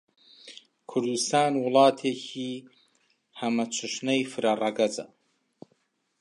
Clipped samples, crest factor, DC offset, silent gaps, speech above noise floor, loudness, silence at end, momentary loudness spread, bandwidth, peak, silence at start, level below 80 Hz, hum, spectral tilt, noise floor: under 0.1%; 22 dB; under 0.1%; none; 46 dB; -26 LUFS; 1.15 s; 23 LU; 11.5 kHz; -6 dBFS; 0.45 s; -84 dBFS; none; -3.5 dB/octave; -72 dBFS